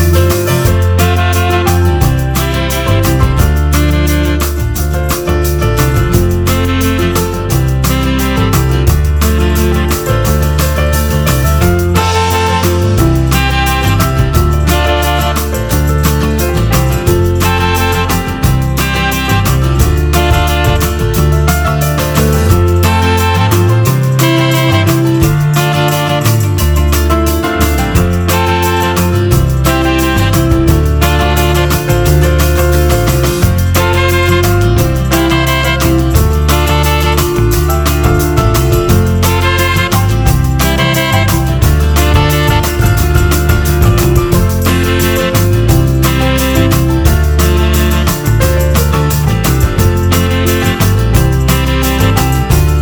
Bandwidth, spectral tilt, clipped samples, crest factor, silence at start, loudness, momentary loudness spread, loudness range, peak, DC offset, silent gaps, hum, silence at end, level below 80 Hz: over 20 kHz; -5.5 dB/octave; 0.4%; 10 dB; 0 s; -11 LUFS; 2 LU; 2 LU; 0 dBFS; under 0.1%; none; none; 0 s; -16 dBFS